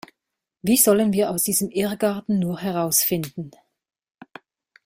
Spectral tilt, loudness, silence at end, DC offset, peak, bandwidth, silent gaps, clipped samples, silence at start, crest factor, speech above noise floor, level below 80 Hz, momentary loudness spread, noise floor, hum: -4 dB/octave; -20 LUFS; 1.35 s; under 0.1%; -2 dBFS; 16 kHz; none; under 0.1%; 0.65 s; 20 dB; 61 dB; -60 dBFS; 13 LU; -82 dBFS; none